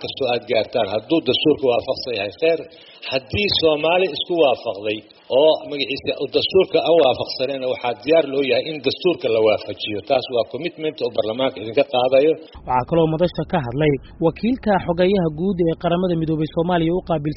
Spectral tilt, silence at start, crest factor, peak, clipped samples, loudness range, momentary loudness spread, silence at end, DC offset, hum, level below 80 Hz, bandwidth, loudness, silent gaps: -4 dB/octave; 0 s; 16 dB; -4 dBFS; under 0.1%; 2 LU; 8 LU; 0 s; under 0.1%; none; -46 dBFS; 6 kHz; -20 LUFS; none